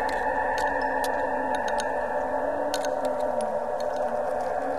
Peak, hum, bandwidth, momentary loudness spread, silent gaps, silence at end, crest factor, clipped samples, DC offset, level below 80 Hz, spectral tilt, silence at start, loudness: -10 dBFS; none; 13 kHz; 2 LU; none; 0 s; 18 dB; under 0.1%; 0.9%; -52 dBFS; -3.5 dB/octave; 0 s; -27 LUFS